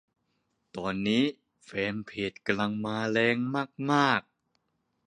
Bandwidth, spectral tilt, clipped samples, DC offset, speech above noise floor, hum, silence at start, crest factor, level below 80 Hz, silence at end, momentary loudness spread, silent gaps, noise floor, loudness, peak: 10 kHz; -5.5 dB/octave; under 0.1%; under 0.1%; 49 dB; none; 0.75 s; 22 dB; -66 dBFS; 0.85 s; 9 LU; none; -77 dBFS; -29 LUFS; -8 dBFS